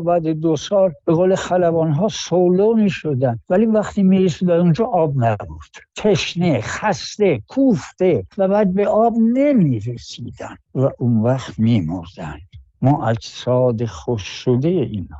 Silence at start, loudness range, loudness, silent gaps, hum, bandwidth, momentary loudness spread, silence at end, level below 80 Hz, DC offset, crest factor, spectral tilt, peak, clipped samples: 0 s; 4 LU; -18 LUFS; none; none; 8 kHz; 12 LU; 0 s; -48 dBFS; under 0.1%; 12 dB; -7 dB/octave; -6 dBFS; under 0.1%